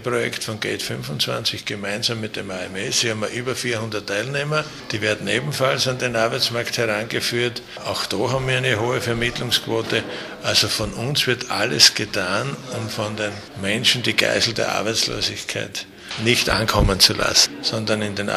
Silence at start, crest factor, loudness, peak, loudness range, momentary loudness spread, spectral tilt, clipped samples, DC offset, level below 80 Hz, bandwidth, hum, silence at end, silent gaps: 0 s; 22 dB; -20 LUFS; 0 dBFS; 5 LU; 11 LU; -3 dB/octave; under 0.1%; under 0.1%; -40 dBFS; 15.5 kHz; none; 0 s; none